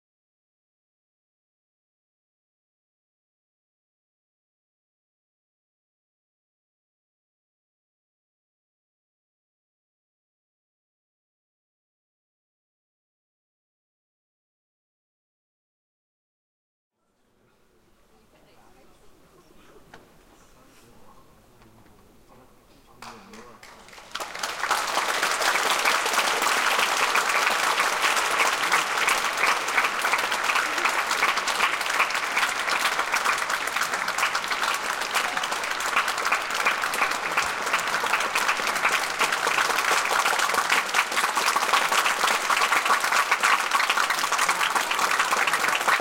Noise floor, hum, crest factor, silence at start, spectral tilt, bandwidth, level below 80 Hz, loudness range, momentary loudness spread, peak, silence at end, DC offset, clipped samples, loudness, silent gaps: -68 dBFS; none; 20 dB; 19.05 s; 0.5 dB/octave; 17 kHz; -64 dBFS; 3 LU; 4 LU; -6 dBFS; 0 s; under 0.1%; under 0.1%; -22 LUFS; none